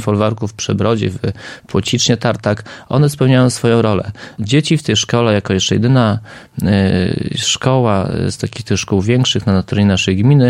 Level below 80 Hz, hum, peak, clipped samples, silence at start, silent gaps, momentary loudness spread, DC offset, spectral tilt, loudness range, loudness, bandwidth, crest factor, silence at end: -44 dBFS; none; 0 dBFS; under 0.1%; 0 s; none; 8 LU; under 0.1%; -5.5 dB/octave; 2 LU; -15 LUFS; 14.5 kHz; 14 dB; 0 s